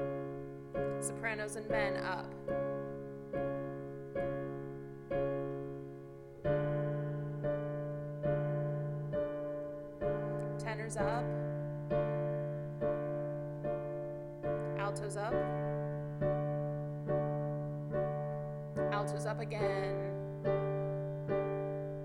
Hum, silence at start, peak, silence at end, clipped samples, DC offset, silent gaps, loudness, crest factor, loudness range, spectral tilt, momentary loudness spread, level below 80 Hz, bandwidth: none; 0 s; -20 dBFS; 0 s; under 0.1%; under 0.1%; none; -38 LUFS; 16 dB; 3 LU; -7 dB/octave; 7 LU; -58 dBFS; 12 kHz